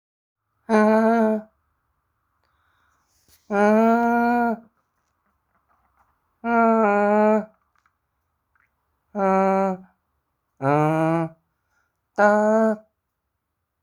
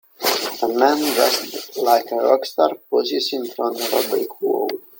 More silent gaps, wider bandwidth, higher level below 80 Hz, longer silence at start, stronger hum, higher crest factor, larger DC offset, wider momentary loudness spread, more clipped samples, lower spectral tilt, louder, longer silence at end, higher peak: neither; second, 10.5 kHz vs 17 kHz; first, -64 dBFS vs -70 dBFS; first, 0.7 s vs 0.2 s; neither; about the same, 20 dB vs 18 dB; neither; first, 15 LU vs 6 LU; neither; first, -8 dB/octave vs -1.5 dB/octave; about the same, -20 LUFS vs -19 LUFS; first, 1.05 s vs 0.2 s; second, -4 dBFS vs 0 dBFS